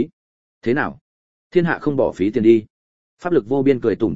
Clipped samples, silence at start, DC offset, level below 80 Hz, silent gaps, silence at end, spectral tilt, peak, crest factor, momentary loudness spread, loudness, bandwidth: under 0.1%; 0 s; 0.8%; -52 dBFS; 0.13-0.61 s, 1.01-1.50 s, 2.70-3.17 s; 0 s; -8.5 dB/octave; -2 dBFS; 18 dB; 11 LU; -19 LUFS; 7.6 kHz